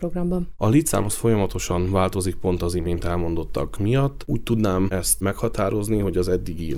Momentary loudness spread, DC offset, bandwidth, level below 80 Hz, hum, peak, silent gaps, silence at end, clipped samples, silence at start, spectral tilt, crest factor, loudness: 5 LU; under 0.1%; over 20 kHz; -34 dBFS; none; -6 dBFS; none; 0 s; under 0.1%; 0 s; -6 dB/octave; 16 dB; -23 LUFS